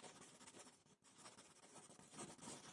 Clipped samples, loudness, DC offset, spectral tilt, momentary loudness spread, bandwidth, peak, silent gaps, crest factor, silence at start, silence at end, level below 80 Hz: under 0.1%; -60 LUFS; under 0.1%; -2.5 dB/octave; 9 LU; 12 kHz; -42 dBFS; none; 20 dB; 0 s; 0 s; under -90 dBFS